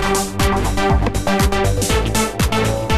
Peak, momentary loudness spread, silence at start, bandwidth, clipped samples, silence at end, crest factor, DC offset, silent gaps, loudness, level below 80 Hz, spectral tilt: -6 dBFS; 2 LU; 0 s; 14 kHz; under 0.1%; 0 s; 12 dB; 2%; none; -17 LUFS; -22 dBFS; -4.5 dB/octave